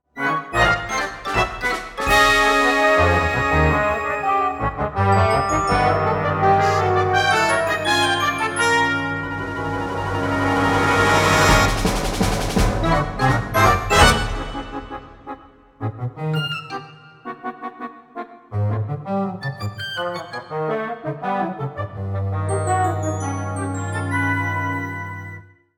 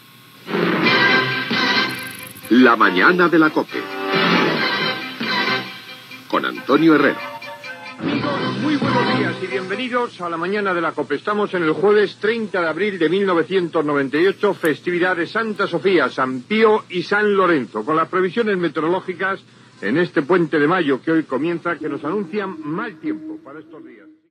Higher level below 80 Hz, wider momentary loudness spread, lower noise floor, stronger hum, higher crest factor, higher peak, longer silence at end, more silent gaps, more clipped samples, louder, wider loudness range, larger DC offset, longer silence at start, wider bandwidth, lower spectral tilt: first, -34 dBFS vs -70 dBFS; first, 16 LU vs 12 LU; about the same, -41 dBFS vs -40 dBFS; neither; about the same, 20 dB vs 18 dB; about the same, 0 dBFS vs 0 dBFS; about the same, 0.35 s vs 0.35 s; neither; neither; about the same, -19 LUFS vs -18 LUFS; first, 11 LU vs 5 LU; neither; second, 0.15 s vs 0.45 s; first, 18 kHz vs 15 kHz; second, -4.5 dB/octave vs -6 dB/octave